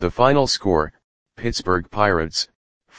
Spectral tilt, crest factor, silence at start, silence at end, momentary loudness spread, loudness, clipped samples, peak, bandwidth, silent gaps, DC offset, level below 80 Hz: -4.5 dB/octave; 20 dB; 0 s; 0 s; 12 LU; -20 LUFS; under 0.1%; 0 dBFS; 10 kHz; 1.04-1.26 s, 2.55-2.81 s; under 0.1%; -40 dBFS